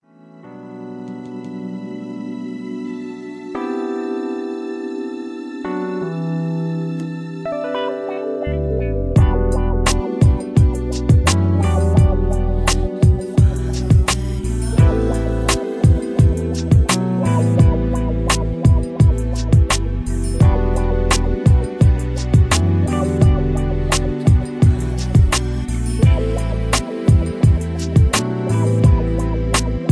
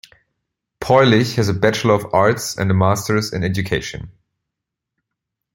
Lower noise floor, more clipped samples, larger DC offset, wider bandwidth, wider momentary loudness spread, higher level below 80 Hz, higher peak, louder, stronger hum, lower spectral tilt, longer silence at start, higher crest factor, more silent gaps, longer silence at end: second, -42 dBFS vs -82 dBFS; neither; neither; second, 11 kHz vs 16.5 kHz; first, 13 LU vs 9 LU; first, -22 dBFS vs -48 dBFS; about the same, 0 dBFS vs -2 dBFS; about the same, -18 LUFS vs -17 LUFS; neither; about the same, -6 dB/octave vs -5.5 dB/octave; second, 0.45 s vs 0.8 s; about the same, 16 dB vs 18 dB; neither; second, 0 s vs 1.45 s